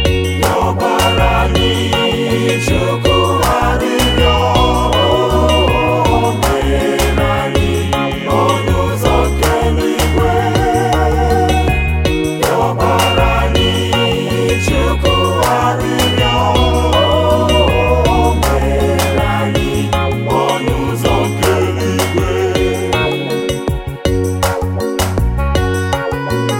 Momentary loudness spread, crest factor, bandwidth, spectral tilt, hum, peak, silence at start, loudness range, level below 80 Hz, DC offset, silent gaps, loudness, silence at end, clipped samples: 4 LU; 12 dB; 17 kHz; -5 dB/octave; none; 0 dBFS; 0 s; 3 LU; -20 dBFS; under 0.1%; none; -13 LUFS; 0 s; under 0.1%